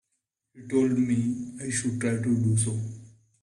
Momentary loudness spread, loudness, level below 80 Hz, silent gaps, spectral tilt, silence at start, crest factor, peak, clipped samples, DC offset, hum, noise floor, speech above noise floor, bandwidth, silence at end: 10 LU; -27 LUFS; -60 dBFS; none; -6 dB/octave; 0.55 s; 16 dB; -12 dBFS; under 0.1%; under 0.1%; none; -80 dBFS; 54 dB; 12 kHz; 0.35 s